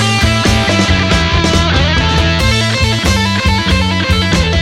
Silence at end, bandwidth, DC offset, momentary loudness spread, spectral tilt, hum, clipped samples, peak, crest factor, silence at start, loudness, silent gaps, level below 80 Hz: 0 s; 15.5 kHz; under 0.1%; 1 LU; -4.5 dB/octave; none; under 0.1%; 0 dBFS; 10 dB; 0 s; -11 LUFS; none; -20 dBFS